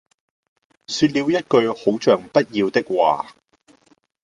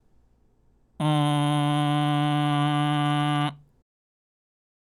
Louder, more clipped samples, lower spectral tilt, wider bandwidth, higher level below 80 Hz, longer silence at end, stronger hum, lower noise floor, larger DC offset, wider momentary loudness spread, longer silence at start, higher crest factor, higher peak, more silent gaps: first, -19 LUFS vs -24 LUFS; neither; second, -5 dB/octave vs -6.5 dB/octave; second, 11 kHz vs 15 kHz; about the same, -60 dBFS vs -64 dBFS; second, 0.95 s vs 1.25 s; neither; second, -58 dBFS vs -62 dBFS; neither; about the same, 5 LU vs 3 LU; about the same, 0.9 s vs 1 s; about the same, 18 dB vs 14 dB; first, -2 dBFS vs -12 dBFS; neither